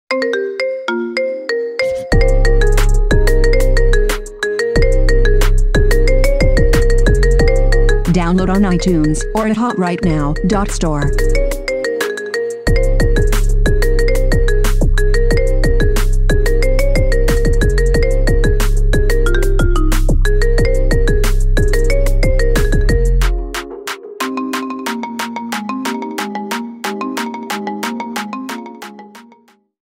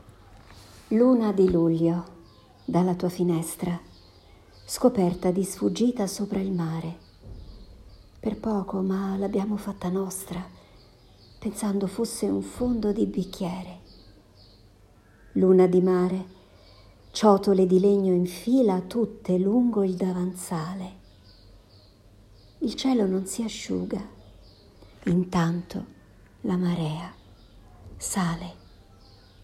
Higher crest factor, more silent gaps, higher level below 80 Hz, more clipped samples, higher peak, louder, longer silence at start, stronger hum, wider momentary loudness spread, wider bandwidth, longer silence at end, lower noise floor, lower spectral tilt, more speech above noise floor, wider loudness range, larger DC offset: second, 10 dB vs 20 dB; neither; first, -14 dBFS vs -52 dBFS; neither; first, -2 dBFS vs -6 dBFS; first, -16 LUFS vs -25 LUFS; second, 0.1 s vs 0.3 s; neither; second, 8 LU vs 16 LU; about the same, 15.5 kHz vs 15 kHz; second, 0.75 s vs 0.9 s; second, -49 dBFS vs -55 dBFS; about the same, -5.5 dB/octave vs -6.5 dB/octave; first, 36 dB vs 31 dB; about the same, 7 LU vs 8 LU; neither